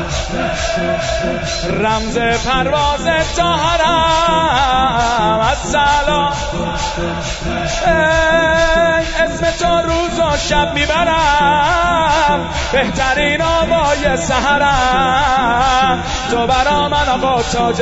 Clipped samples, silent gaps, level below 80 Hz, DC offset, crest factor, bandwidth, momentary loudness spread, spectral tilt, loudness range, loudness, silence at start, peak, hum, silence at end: under 0.1%; none; -26 dBFS; under 0.1%; 14 dB; 8 kHz; 6 LU; -4 dB/octave; 2 LU; -14 LUFS; 0 s; 0 dBFS; none; 0 s